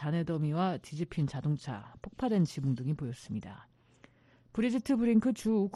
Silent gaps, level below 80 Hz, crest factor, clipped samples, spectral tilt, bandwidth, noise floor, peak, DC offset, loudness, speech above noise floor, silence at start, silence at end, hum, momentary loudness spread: none; -62 dBFS; 16 dB; under 0.1%; -7.5 dB/octave; 12 kHz; -62 dBFS; -16 dBFS; under 0.1%; -32 LUFS; 31 dB; 0 s; 0 s; none; 13 LU